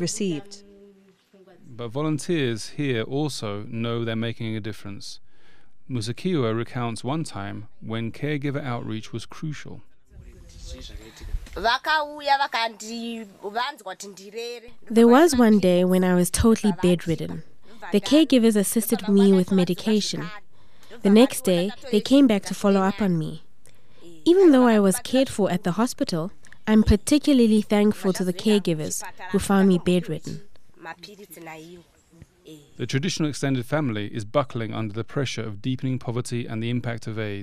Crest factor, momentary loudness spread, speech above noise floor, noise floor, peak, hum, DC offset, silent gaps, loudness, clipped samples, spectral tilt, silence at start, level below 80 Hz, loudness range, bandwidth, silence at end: 18 dB; 20 LU; 37 dB; -60 dBFS; -4 dBFS; none; 1%; none; -22 LUFS; under 0.1%; -5.5 dB/octave; 0 s; -44 dBFS; 10 LU; 15.5 kHz; 0 s